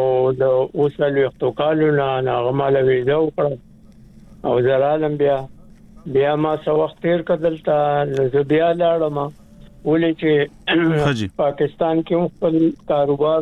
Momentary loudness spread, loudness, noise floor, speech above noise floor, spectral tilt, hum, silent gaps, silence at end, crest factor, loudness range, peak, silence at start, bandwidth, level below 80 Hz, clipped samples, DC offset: 5 LU; -19 LUFS; -44 dBFS; 27 dB; -8 dB/octave; none; none; 0 s; 14 dB; 2 LU; -6 dBFS; 0 s; 9 kHz; -50 dBFS; under 0.1%; under 0.1%